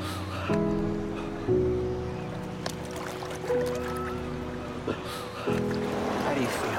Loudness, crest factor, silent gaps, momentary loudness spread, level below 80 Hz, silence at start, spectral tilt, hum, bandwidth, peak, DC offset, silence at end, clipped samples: -31 LUFS; 18 dB; none; 8 LU; -46 dBFS; 0 s; -6 dB/octave; none; 17 kHz; -12 dBFS; under 0.1%; 0 s; under 0.1%